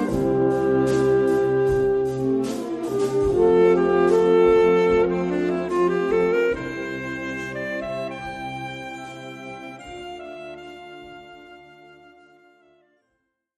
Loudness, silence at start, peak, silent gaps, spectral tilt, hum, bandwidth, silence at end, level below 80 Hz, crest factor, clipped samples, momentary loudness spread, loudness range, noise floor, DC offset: -21 LUFS; 0 s; -6 dBFS; none; -7 dB/octave; none; 13 kHz; 2 s; -46 dBFS; 16 dB; under 0.1%; 20 LU; 20 LU; -75 dBFS; under 0.1%